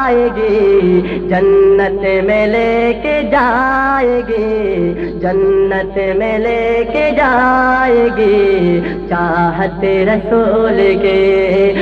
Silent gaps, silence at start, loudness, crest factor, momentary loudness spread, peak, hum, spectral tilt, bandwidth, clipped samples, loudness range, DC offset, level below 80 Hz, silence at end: none; 0 s; -12 LUFS; 10 dB; 5 LU; -2 dBFS; none; -8 dB/octave; 5.4 kHz; under 0.1%; 2 LU; under 0.1%; -32 dBFS; 0 s